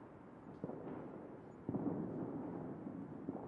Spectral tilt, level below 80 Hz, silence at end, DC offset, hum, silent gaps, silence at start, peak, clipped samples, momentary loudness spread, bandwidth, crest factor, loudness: -11 dB/octave; -74 dBFS; 0 s; under 0.1%; none; none; 0 s; -28 dBFS; under 0.1%; 12 LU; 4.5 kHz; 18 dB; -47 LUFS